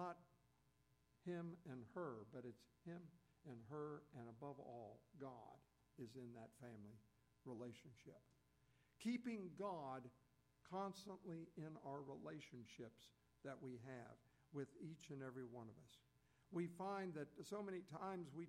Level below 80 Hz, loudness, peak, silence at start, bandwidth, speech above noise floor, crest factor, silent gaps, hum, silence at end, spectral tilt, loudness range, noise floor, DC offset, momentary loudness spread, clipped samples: -86 dBFS; -55 LUFS; -36 dBFS; 0 s; 14.5 kHz; 27 dB; 18 dB; none; none; 0 s; -6.5 dB/octave; 7 LU; -81 dBFS; under 0.1%; 13 LU; under 0.1%